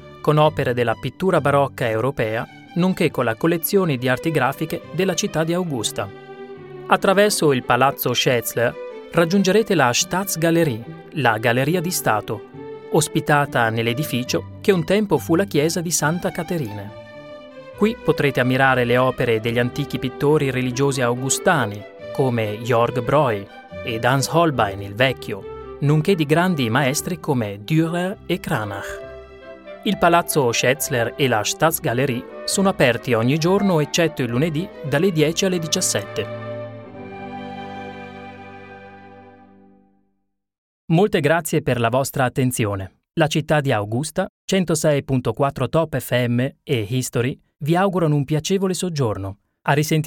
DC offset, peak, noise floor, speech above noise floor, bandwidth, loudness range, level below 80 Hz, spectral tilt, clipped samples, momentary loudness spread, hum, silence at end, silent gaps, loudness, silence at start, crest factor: under 0.1%; 0 dBFS; -73 dBFS; 53 dB; 17.5 kHz; 4 LU; -50 dBFS; -5 dB/octave; under 0.1%; 15 LU; none; 0 s; 40.58-40.88 s, 44.29-44.48 s; -20 LUFS; 0 s; 20 dB